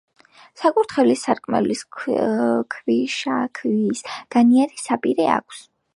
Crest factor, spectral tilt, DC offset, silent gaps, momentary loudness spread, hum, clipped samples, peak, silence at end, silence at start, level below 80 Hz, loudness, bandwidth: 18 dB; -5 dB/octave; under 0.1%; none; 7 LU; none; under 0.1%; -2 dBFS; 0.35 s; 0.6 s; -66 dBFS; -20 LUFS; 11.5 kHz